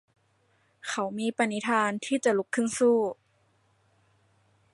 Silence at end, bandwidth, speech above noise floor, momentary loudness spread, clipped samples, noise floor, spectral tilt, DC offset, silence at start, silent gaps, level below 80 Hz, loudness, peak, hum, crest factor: 1.6 s; 11.5 kHz; 42 dB; 10 LU; under 0.1%; -68 dBFS; -4 dB/octave; under 0.1%; 0.85 s; none; -76 dBFS; -27 LUFS; -10 dBFS; none; 20 dB